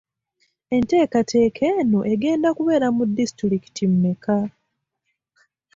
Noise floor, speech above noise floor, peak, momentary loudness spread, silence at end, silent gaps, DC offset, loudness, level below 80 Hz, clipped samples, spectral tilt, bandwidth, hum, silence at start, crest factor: -76 dBFS; 57 dB; -8 dBFS; 5 LU; 1.25 s; none; under 0.1%; -20 LUFS; -56 dBFS; under 0.1%; -7 dB/octave; 7.8 kHz; none; 0.7 s; 14 dB